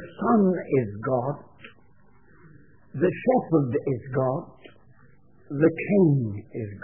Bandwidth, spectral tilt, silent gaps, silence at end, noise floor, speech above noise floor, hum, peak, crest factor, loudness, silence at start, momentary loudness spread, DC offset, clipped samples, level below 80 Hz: 3.4 kHz; -13 dB/octave; none; 0.05 s; -59 dBFS; 35 dB; none; -8 dBFS; 18 dB; -24 LUFS; 0 s; 14 LU; 0.2%; under 0.1%; -62 dBFS